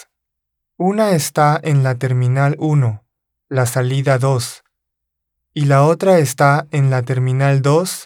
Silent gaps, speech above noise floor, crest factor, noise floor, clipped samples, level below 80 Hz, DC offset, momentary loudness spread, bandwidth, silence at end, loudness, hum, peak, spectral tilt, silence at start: none; 63 dB; 16 dB; -78 dBFS; under 0.1%; -66 dBFS; under 0.1%; 8 LU; 16.5 kHz; 0 s; -15 LUFS; none; 0 dBFS; -6.5 dB/octave; 0.8 s